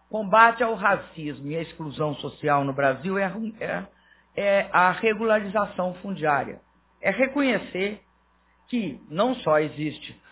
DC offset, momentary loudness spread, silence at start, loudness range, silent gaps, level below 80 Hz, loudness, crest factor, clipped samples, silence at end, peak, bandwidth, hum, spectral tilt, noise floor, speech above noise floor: under 0.1%; 12 LU; 0.1 s; 4 LU; none; -60 dBFS; -24 LUFS; 22 dB; under 0.1%; 0.2 s; -2 dBFS; 4 kHz; none; -9.5 dB/octave; -63 dBFS; 39 dB